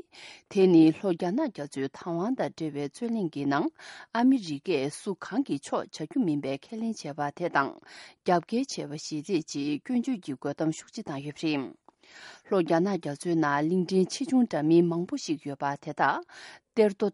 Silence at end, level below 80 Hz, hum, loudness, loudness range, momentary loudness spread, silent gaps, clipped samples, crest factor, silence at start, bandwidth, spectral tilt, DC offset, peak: 0 s; -74 dBFS; none; -28 LUFS; 5 LU; 12 LU; none; under 0.1%; 18 dB; 0.15 s; 11.5 kHz; -6 dB/octave; under 0.1%; -10 dBFS